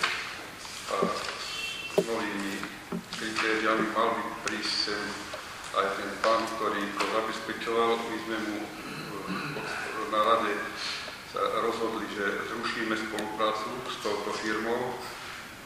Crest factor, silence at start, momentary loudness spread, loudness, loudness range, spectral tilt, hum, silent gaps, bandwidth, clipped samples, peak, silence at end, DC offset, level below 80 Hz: 22 dB; 0 s; 10 LU; -30 LUFS; 2 LU; -3.5 dB/octave; none; none; 15.5 kHz; under 0.1%; -10 dBFS; 0 s; under 0.1%; -62 dBFS